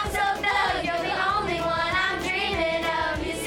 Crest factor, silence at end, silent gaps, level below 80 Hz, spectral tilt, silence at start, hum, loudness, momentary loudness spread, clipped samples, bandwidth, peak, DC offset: 14 dB; 0 s; none; -42 dBFS; -3.5 dB/octave; 0 s; none; -24 LUFS; 3 LU; under 0.1%; 19 kHz; -10 dBFS; under 0.1%